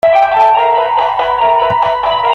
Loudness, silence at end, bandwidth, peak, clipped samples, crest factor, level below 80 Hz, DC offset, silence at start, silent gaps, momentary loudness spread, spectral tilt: -11 LUFS; 0 s; 7.2 kHz; 0 dBFS; under 0.1%; 10 dB; -44 dBFS; under 0.1%; 0.05 s; none; 4 LU; -4.5 dB/octave